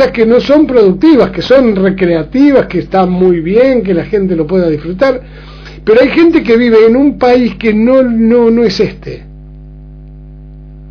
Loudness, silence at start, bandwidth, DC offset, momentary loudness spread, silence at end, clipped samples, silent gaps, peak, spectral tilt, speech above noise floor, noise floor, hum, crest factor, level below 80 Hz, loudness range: -9 LUFS; 0 s; 5.4 kHz; under 0.1%; 6 LU; 0 s; 1%; none; 0 dBFS; -8 dB/octave; 22 dB; -30 dBFS; 50 Hz at -30 dBFS; 8 dB; -32 dBFS; 3 LU